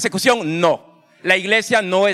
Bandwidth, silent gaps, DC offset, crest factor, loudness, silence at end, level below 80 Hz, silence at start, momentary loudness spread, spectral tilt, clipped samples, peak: 15.5 kHz; none; under 0.1%; 16 dB; -17 LUFS; 0 s; -64 dBFS; 0 s; 7 LU; -3.5 dB/octave; under 0.1%; -2 dBFS